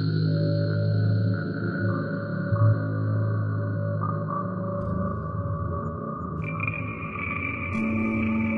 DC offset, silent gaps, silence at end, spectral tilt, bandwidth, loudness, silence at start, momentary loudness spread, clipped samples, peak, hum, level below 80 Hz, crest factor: under 0.1%; none; 0 s; -10 dB/octave; 4.9 kHz; -27 LUFS; 0 s; 7 LU; under 0.1%; -12 dBFS; none; -50 dBFS; 14 dB